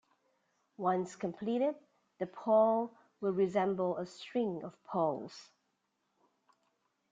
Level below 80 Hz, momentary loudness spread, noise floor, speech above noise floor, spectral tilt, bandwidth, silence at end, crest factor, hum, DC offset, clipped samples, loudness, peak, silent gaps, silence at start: -80 dBFS; 14 LU; -81 dBFS; 48 dB; -7 dB/octave; 7.8 kHz; 1.7 s; 18 dB; none; under 0.1%; under 0.1%; -34 LUFS; -16 dBFS; none; 0.8 s